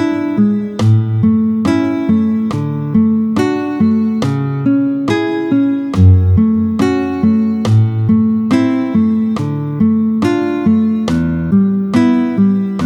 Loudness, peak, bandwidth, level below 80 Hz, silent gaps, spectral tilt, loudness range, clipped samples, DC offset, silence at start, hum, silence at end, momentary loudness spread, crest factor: -13 LUFS; 0 dBFS; 9.4 kHz; -38 dBFS; none; -8.5 dB/octave; 2 LU; under 0.1%; under 0.1%; 0 s; none; 0 s; 4 LU; 12 dB